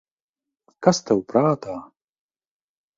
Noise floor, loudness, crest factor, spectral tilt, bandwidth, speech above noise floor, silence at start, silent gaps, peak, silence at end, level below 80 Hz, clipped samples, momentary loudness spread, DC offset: under -90 dBFS; -21 LUFS; 24 dB; -5.5 dB/octave; 7.6 kHz; over 70 dB; 0.8 s; none; -2 dBFS; 1.15 s; -62 dBFS; under 0.1%; 14 LU; under 0.1%